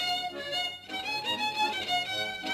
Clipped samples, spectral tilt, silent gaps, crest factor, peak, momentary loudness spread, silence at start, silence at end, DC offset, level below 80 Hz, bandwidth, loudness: under 0.1%; -1.5 dB/octave; none; 14 dB; -18 dBFS; 5 LU; 0 s; 0 s; under 0.1%; -66 dBFS; 14 kHz; -30 LUFS